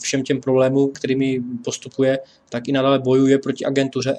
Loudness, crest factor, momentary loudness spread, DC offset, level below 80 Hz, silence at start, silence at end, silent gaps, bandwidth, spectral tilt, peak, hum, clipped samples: -19 LUFS; 16 dB; 11 LU; under 0.1%; -62 dBFS; 0 s; 0 s; none; 10 kHz; -5.5 dB/octave; -4 dBFS; none; under 0.1%